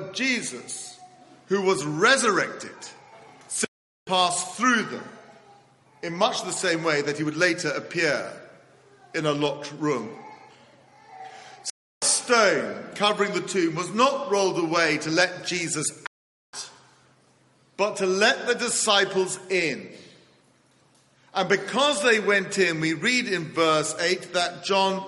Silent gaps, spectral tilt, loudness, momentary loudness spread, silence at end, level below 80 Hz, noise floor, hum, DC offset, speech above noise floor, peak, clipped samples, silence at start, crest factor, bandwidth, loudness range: 3.68-4.06 s, 11.70-12.01 s, 16.07-16.53 s; -2.5 dB/octave; -23 LUFS; 18 LU; 0 s; -72 dBFS; -61 dBFS; none; under 0.1%; 37 dB; -4 dBFS; under 0.1%; 0 s; 22 dB; 11.5 kHz; 5 LU